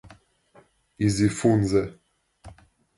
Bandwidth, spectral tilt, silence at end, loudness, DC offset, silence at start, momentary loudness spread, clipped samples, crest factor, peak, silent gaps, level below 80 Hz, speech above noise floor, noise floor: 11.5 kHz; -6.5 dB/octave; 0.45 s; -23 LUFS; under 0.1%; 0.05 s; 6 LU; under 0.1%; 18 dB; -8 dBFS; none; -48 dBFS; 36 dB; -58 dBFS